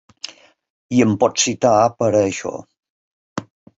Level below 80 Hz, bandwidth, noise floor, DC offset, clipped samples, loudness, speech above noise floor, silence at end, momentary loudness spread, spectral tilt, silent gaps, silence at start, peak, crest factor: -54 dBFS; 8 kHz; -38 dBFS; under 0.1%; under 0.1%; -17 LUFS; 21 dB; 0.35 s; 19 LU; -4.5 dB/octave; 2.90-3.36 s; 0.9 s; -2 dBFS; 18 dB